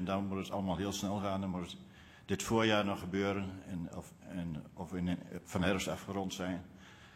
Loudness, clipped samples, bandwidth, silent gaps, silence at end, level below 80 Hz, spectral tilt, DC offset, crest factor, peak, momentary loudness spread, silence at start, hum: -37 LUFS; under 0.1%; 16 kHz; none; 0 s; -60 dBFS; -5 dB/octave; under 0.1%; 22 dB; -16 dBFS; 14 LU; 0 s; none